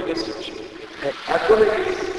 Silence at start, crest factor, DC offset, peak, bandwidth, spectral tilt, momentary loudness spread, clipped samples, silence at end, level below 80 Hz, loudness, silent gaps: 0 s; 18 dB; under 0.1%; -2 dBFS; 11 kHz; -4.5 dB/octave; 17 LU; under 0.1%; 0 s; -48 dBFS; -21 LUFS; none